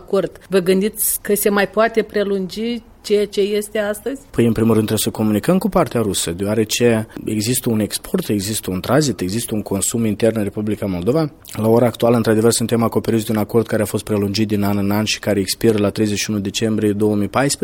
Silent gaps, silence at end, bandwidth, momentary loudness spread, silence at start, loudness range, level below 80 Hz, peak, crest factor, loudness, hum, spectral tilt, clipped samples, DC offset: none; 0.1 s; 17 kHz; 6 LU; 0 s; 2 LU; -46 dBFS; -2 dBFS; 16 dB; -18 LUFS; none; -5 dB/octave; under 0.1%; under 0.1%